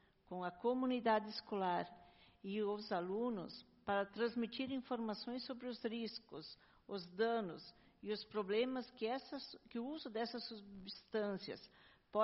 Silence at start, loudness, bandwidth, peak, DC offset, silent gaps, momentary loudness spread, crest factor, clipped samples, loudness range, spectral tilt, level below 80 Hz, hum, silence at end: 0.3 s; -43 LUFS; 5.8 kHz; -22 dBFS; under 0.1%; none; 14 LU; 20 dB; under 0.1%; 4 LU; -3.5 dB/octave; -78 dBFS; none; 0 s